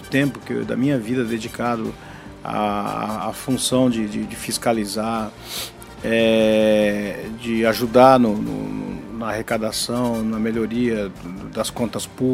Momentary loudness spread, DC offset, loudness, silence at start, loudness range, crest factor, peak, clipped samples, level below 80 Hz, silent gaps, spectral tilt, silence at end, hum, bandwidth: 13 LU; under 0.1%; -21 LUFS; 0 s; 6 LU; 20 dB; 0 dBFS; under 0.1%; -48 dBFS; none; -5 dB/octave; 0 s; none; 16 kHz